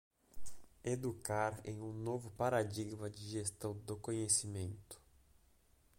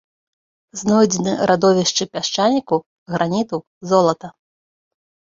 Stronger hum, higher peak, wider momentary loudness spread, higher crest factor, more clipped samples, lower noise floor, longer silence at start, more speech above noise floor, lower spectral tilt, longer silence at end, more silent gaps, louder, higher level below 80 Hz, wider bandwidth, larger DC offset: neither; second, -20 dBFS vs -2 dBFS; first, 23 LU vs 12 LU; about the same, 22 dB vs 18 dB; neither; second, -70 dBFS vs under -90 dBFS; second, 0.35 s vs 0.75 s; second, 30 dB vs over 72 dB; about the same, -4.5 dB/octave vs -4.5 dB/octave; second, 0.45 s vs 1.1 s; second, none vs 2.86-3.06 s, 3.67-3.81 s; second, -40 LUFS vs -18 LUFS; second, -66 dBFS vs -58 dBFS; first, 16.5 kHz vs 7.8 kHz; neither